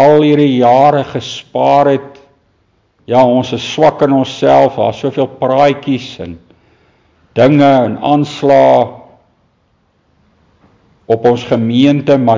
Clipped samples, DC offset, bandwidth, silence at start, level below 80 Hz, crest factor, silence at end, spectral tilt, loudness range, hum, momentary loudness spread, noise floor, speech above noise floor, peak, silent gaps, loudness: under 0.1%; under 0.1%; 7.6 kHz; 0 s; -50 dBFS; 12 dB; 0 s; -7 dB/octave; 3 LU; none; 11 LU; -57 dBFS; 47 dB; 0 dBFS; none; -11 LUFS